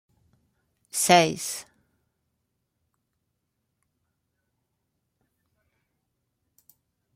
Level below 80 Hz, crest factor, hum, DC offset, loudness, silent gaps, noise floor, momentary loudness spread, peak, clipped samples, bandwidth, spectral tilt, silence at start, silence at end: -72 dBFS; 30 dB; none; under 0.1%; -22 LUFS; none; -79 dBFS; 15 LU; -2 dBFS; under 0.1%; 16 kHz; -3 dB/octave; 0.95 s; 5.55 s